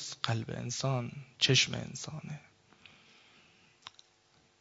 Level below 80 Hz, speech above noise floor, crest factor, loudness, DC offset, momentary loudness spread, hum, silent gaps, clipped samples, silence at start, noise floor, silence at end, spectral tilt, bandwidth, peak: -68 dBFS; 34 dB; 24 dB; -32 LUFS; under 0.1%; 27 LU; none; none; under 0.1%; 0 s; -68 dBFS; 0.7 s; -3.5 dB/octave; 8 kHz; -12 dBFS